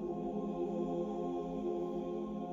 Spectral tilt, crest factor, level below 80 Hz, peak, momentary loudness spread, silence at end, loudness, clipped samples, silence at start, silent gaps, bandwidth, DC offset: -9 dB/octave; 12 dB; -62 dBFS; -26 dBFS; 2 LU; 0 s; -39 LUFS; under 0.1%; 0 s; none; 7.4 kHz; under 0.1%